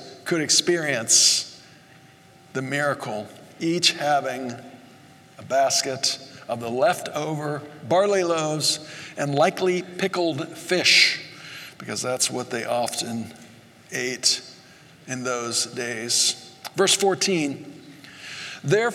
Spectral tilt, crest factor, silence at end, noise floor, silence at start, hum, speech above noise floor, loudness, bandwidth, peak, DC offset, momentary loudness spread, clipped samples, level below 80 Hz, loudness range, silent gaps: -2 dB/octave; 22 dB; 0 s; -51 dBFS; 0 s; none; 28 dB; -22 LUFS; 16.5 kHz; -2 dBFS; under 0.1%; 16 LU; under 0.1%; -76 dBFS; 5 LU; none